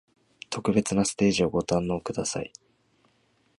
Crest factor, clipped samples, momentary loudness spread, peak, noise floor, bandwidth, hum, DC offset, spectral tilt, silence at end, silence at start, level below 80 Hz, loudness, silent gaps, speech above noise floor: 18 dB; under 0.1%; 12 LU; -10 dBFS; -67 dBFS; 11.5 kHz; none; under 0.1%; -5 dB/octave; 1.1 s; 0.5 s; -54 dBFS; -26 LUFS; none; 41 dB